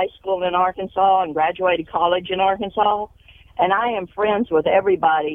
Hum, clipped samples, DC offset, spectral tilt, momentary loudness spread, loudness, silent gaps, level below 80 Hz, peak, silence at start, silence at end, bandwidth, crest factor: none; under 0.1%; under 0.1%; -7.5 dB/octave; 6 LU; -19 LUFS; none; -52 dBFS; -4 dBFS; 0 s; 0 s; 3.8 kHz; 16 dB